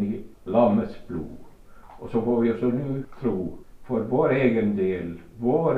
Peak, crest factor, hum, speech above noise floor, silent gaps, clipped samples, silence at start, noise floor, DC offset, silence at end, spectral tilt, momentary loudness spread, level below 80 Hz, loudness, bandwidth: -8 dBFS; 16 dB; none; 22 dB; none; under 0.1%; 0 s; -45 dBFS; under 0.1%; 0 s; -9.5 dB/octave; 14 LU; -50 dBFS; -25 LUFS; 5 kHz